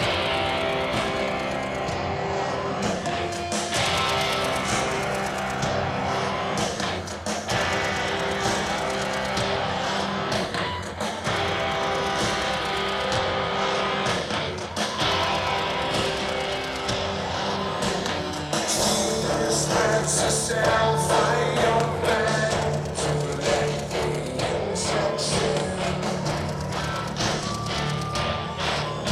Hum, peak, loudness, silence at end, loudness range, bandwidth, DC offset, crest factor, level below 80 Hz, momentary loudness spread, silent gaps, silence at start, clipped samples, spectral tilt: none; -8 dBFS; -25 LUFS; 0 s; 4 LU; 15.5 kHz; under 0.1%; 16 dB; -44 dBFS; 6 LU; none; 0 s; under 0.1%; -3.5 dB/octave